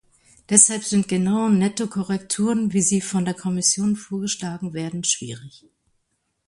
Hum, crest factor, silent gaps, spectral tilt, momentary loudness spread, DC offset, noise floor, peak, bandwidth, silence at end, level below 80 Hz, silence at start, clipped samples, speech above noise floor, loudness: none; 22 dB; none; -4 dB/octave; 12 LU; under 0.1%; -73 dBFS; 0 dBFS; 11.5 kHz; 1 s; -60 dBFS; 0.5 s; under 0.1%; 51 dB; -20 LUFS